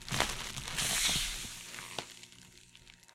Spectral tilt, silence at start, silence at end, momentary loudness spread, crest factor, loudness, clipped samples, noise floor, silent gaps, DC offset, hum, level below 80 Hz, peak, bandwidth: -1 dB/octave; 0 s; 0.2 s; 23 LU; 30 dB; -34 LUFS; under 0.1%; -58 dBFS; none; under 0.1%; 60 Hz at -65 dBFS; -50 dBFS; -8 dBFS; 16.5 kHz